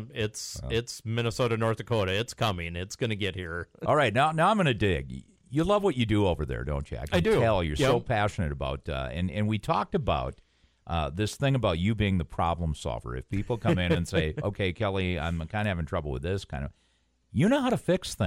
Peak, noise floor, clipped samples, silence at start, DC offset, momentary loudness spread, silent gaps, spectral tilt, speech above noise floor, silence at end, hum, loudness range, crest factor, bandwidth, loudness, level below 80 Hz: -10 dBFS; -69 dBFS; under 0.1%; 0 s; under 0.1%; 10 LU; none; -6 dB/octave; 42 dB; 0 s; none; 4 LU; 18 dB; 16 kHz; -28 LUFS; -42 dBFS